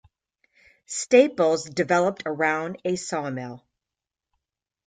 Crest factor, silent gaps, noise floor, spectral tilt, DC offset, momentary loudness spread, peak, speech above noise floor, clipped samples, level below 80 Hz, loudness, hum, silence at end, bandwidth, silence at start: 22 dB; none; -88 dBFS; -4.5 dB/octave; under 0.1%; 14 LU; -4 dBFS; 65 dB; under 0.1%; -68 dBFS; -23 LUFS; none; 1.3 s; 9.4 kHz; 0.9 s